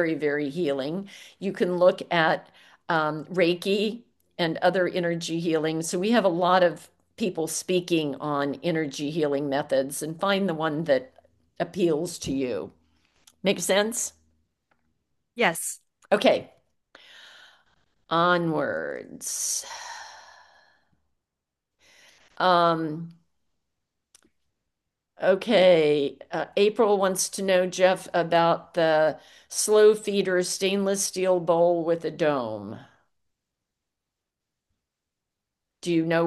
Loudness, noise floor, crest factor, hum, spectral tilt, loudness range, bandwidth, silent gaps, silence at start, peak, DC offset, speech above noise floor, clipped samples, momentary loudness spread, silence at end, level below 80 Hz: -24 LUFS; -85 dBFS; 20 dB; none; -4 dB/octave; 7 LU; 12.5 kHz; none; 0 s; -4 dBFS; under 0.1%; 61 dB; under 0.1%; 13 LU; 0 s; -68 dBFS